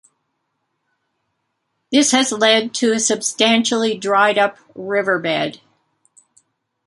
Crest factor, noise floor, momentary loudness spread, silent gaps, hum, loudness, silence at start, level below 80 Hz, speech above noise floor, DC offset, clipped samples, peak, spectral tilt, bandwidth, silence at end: 18 dB; -72 dBFS; 7 LU; none; none; -16 LUFS; 1.9 s; -68 dBFS; 56 dB; under 0.1%; under 0.1%; 0 dBFS; -2 dB/octave; 11.5 kHz; 1.3 s